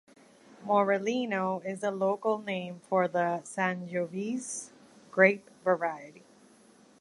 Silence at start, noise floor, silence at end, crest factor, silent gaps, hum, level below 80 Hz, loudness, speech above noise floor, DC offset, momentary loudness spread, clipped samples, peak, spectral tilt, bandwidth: 0.6 s; -59 dBFS; 0.8 s; 24 dB; none; none; -80 dBFS; -30 LUFS; 30 dB; under 0.1%; 12 LU; under 0.1%; -8 dBFS; -5 dB/octave; 11.5 kHz